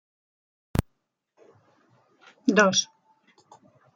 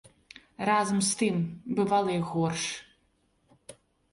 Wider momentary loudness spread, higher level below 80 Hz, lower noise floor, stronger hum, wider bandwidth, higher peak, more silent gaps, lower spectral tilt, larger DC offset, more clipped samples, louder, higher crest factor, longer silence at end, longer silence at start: first, 11 LU vs 8 LU; first, -50 dBFS vs -64 dBFS; first, -75 dBFS vs -70 dBFS; neither; about the same, 11.5 kHz vs 11.5 kHz; first, -6 dBFS vs -14 dBFS; neither; about the same, -3.5 dB/octave vs -4.5 dB/octave; neither; neither; first, -24 LUFS vs -28 LUFS; first, 24 dB vs 18 dB; first, 1.1 s vs 0.4 s; first, 0.75 s vs 0.6 s